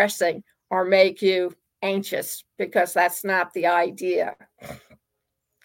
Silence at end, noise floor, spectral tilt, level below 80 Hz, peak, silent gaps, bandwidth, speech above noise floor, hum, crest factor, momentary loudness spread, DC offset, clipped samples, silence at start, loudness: 0.9 s; -80 dBFS; -3.5 dB/octave; -68 dBFS; -4 dBFS; none; 17 kHz; 57 dB; none; 20 dB; 16 LU; under 0.1%; under 0.1%; 0 s; -23 LUFS